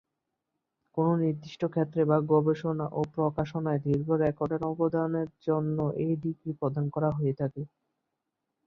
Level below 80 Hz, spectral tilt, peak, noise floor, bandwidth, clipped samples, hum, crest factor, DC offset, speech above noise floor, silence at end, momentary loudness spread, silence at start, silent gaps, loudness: -62 dBFS; -10 dB/octave; -10 dBFS; -84 dBFS; 6.6 kHz; under 0.1%; none; 20 dB; under 0.1%; 56 dB; 1 s; 7 LU; 0.95 s; none; -29 LUFS